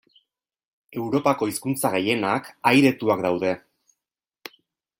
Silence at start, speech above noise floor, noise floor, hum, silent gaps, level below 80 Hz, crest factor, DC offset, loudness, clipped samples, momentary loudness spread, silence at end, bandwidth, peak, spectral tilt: 0.95 s; 66 dB; -88 dBFS; none; none; -66 dBFS; 20 dB; under 0.1%; -22 LUFS; under 0.1%; 23 LU; 1.4 s; 16.5 kHz; -4 dBFS; -5 dB/octave